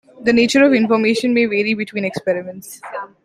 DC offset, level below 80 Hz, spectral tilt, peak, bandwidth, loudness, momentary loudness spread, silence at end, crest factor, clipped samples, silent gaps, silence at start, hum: under 0.1%; -58 dBFS; -4.5 dB/octave; -2 dBFS; 15 kHz; -16 LUFS; 18 LU; 0.2 s; 14 dB; under 0.1%; none; 0.2 s; none